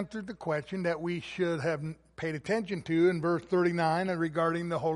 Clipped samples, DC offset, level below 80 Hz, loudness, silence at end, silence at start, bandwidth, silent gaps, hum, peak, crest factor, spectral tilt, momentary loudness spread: under 0.1%; under 0.1%; -64 dBFS; -31 LUFS; 0 s; 0 s; 11.5 kHz; none; none; -14 dBFS; 16 dB; -7 dB/octave; 10 LU